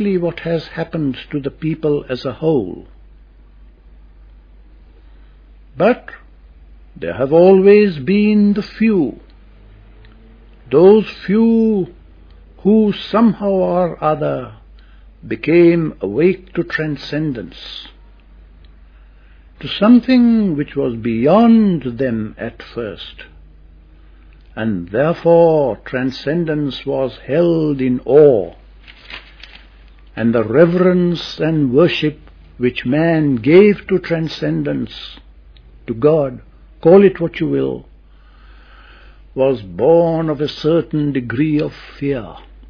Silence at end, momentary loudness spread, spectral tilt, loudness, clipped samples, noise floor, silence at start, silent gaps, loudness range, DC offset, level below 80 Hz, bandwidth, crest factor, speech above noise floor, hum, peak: 0.3 s; 17 LU; -9 dB/octave; -15 LUFS; under 0.1%; -44 dBFS; 0 s; none; 9 LU; under 0.1%; -42 dBFS; 5.4 kHz; 16 dB; 29 dB; none; 0 dBFS